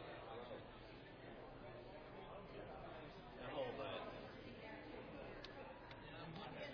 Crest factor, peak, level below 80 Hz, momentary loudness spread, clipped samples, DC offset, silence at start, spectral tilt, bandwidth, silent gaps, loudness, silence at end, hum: 18 dB; -36 dBFS; -68 dBFS; 9 LU; under 0.1%; under 0.1%; 0 s; -3.5 dB/octave; 5.4 kHz; none; -54 LUFS; 0 s; none